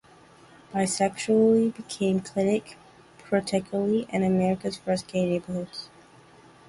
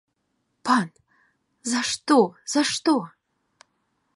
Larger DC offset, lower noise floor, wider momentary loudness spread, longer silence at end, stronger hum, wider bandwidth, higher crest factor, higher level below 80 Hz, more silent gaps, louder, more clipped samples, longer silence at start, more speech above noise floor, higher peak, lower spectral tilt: neither; second, -53 dBFS vs -74 dBFS; about the same, 12 LU vs 14 LU; second, 0.8 s vs 1.1 s; neither; about the same, 11.5 kHz vs 11.5 kHz; about the same, 18 dB vs 20 dB; first, -62 dBFS vs -72 dBFS; neither; second, -26 LUFS vs -23 LUFS; neither; about the same, 0.7 s vs 0.65 s; second, 28 dB vs 52 dB; about the same, -8 dBFS vs -6 dBFS; first, -5.5 dB/octave vs -3 dB/octave